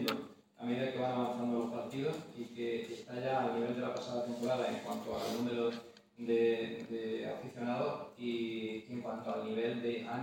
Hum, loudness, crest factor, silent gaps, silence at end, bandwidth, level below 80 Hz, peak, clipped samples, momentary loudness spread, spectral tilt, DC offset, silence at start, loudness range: none; -38 LUFS; 22 dB; none; 0 s; 16.5 kHz; -76 dBFS; -16 dBFS; under 0.1%; 8 LU; -6 dB/octave; under 0.1%; 0 s; 2 LU